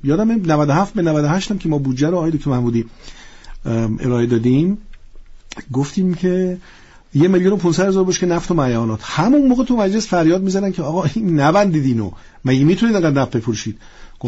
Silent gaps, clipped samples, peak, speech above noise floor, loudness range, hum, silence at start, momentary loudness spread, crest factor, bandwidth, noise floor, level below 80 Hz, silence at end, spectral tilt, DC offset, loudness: none; under 0.1%; -4 dBFS; 21 dB; 4 LU; none; 0.05 s; 9 LU; 12 dB; 8 kHz; -37 dBFS; -38 dBFS; 0 s; -6.5 dB/octave; under 0.1%; -17 LUFS